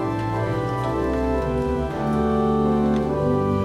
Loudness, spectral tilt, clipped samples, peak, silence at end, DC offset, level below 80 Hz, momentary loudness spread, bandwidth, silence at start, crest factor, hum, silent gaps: -22 LUFS; -8.5 dB/octave; under 0.1%; -8 dBFS; 0 s; under 0.1%; -34 dBFS; 4 LU; 12 kHz; 0 s; 12 dB; none; none